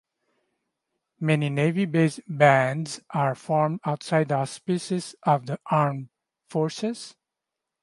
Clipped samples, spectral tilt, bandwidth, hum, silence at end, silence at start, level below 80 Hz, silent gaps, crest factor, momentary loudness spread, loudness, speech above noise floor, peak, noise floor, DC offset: under 0.1%; -6.5 dB/octave; 11.5 kHz; none; 0.7 s; 1.2 s; -72 dBFS; none; 22 dB; 10 LU; -25 LUFS; 62 dB; -2 dBFS; -86 dBFS; under 0.1%